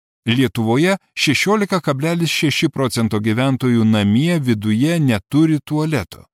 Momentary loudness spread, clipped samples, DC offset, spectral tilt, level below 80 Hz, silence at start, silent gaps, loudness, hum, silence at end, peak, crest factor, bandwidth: 4 LU; under 0.1%; under 0.1%; -5.5 dB/octave; -54 dBFS; 0.25 s; none; -17 LUFS; none; 0.2 s; -4 dBFS; 14 dB; 16 kHz